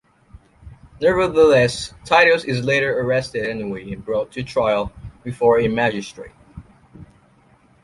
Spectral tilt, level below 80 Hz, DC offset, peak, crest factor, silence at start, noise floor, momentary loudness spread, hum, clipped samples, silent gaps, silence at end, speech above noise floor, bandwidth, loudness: -5 dB/octave; -46 dBFS; under 0.1%; -2 dBFS; 18 dB; 0.65 s; -54 dBFS; 17 LU; none; under 0.1%; none; 0.8 s; 36 dB; 11.5 kHz; -18 LUFS